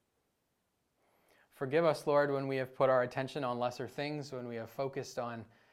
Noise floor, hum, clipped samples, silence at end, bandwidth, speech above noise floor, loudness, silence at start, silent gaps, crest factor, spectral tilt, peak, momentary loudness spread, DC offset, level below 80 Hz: -81 dBFS; none; under 0.1%; 0.25 s; 15 kHz; 47 dB; -35 LUFS; 1.6 s; none; 20 dB; -6 dB/octave; -16 dBFS; 12 LU; under 0.1%; -78 dBFS